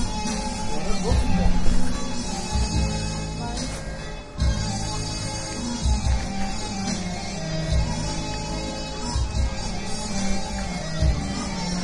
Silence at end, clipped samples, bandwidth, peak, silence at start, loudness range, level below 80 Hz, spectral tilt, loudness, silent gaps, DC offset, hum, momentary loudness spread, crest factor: 0 s; under 0.1%; 11.5 kHz; -4 dBFS; 0 s; 2 LU; -28 dBFS; -4.5 dB/octave; -27 LUFS; none; under 0.1%; none; 6 LU; 18 dB